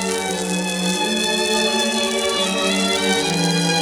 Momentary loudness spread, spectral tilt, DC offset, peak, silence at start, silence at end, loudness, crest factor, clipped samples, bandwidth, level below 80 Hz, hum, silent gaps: 4 LU; -3 dB/octave; under 0.1%; -4 dBFS; 0 s; 0 s; -18 LUFS; 16 dB; under 0.1%; over 20 kHz; -52 dBFS; none; none